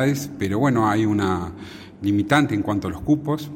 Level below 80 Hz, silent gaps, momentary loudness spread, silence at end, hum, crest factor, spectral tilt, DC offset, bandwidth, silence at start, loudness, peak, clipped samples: -48 dBFS; none; 9 LU; 0 s; none; 18 dB; -6.5 dB/octave; under 0.1%; 16.5 kHz; 0 s; -21 LUFS; -2 dBFS; under 0.1%